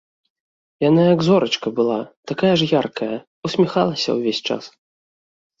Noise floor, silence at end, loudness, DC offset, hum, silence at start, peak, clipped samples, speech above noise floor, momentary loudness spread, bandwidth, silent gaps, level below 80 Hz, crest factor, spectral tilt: under -90 dBFS; 0.9 s; -19 LUFS; under 0.1%; none; 0.8 s; -2 dBFS; under 0.1%; over 72 dB; 12 LU; 7.8 kHz; 2.17-2.23 s, 3.27-3.42 s; -60 dBFS; 18 dB; -6 dB/octave